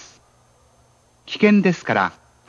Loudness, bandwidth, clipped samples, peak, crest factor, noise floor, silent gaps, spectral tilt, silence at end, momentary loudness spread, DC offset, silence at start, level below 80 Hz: -18 LUFS; 7.4 kHz; under 0.1%; -2 dBFS; 20 dB; -57 dBFS; none; -6.5 dB/octave; 0.4 s; 10 LU; under 0.1%; 1.3 s; -64 dBFS